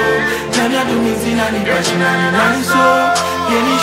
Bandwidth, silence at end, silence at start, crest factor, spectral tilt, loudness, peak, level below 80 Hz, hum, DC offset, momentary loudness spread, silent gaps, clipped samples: 16 kHz; 0 s; 0 s; 14 dB; -4 dB/octave; -14 LUFS; 0 dBFS; -42 dBFS; none; under 0.1%; 4 LU; none; under 0.1%